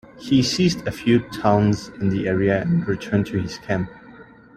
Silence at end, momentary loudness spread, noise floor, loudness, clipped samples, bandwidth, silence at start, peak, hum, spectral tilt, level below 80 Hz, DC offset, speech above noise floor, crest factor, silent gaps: 0.35 s; 7 LU; -45 dBFS; -21 LUFS; under 0.1%; 14 kHz; 0.15 s; -2 dBFS; none; -6 dB/octave; -48 dBFS; under 0.1%; 25 dB; 20 dB; none